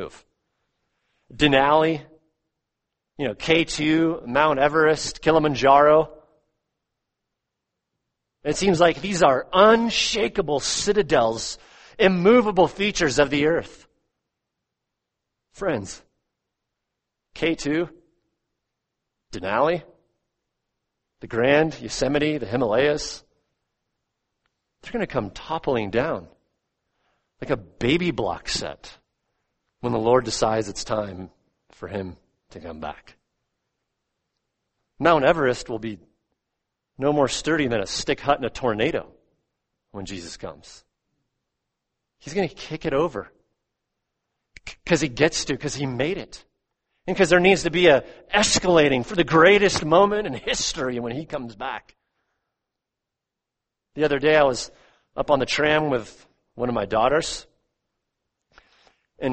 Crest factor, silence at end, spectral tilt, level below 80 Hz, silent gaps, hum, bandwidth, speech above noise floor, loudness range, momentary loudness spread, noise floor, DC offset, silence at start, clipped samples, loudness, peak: 22 dB; 0 s; -4 dB/octave; -48 dBFS; none; none; 8.8 kHz; 64 dB; 12 LU; 18 LU; -85 dBFS; under 0.1%; 0 s; under 0.1%; -21 LUFS; -2 dBFS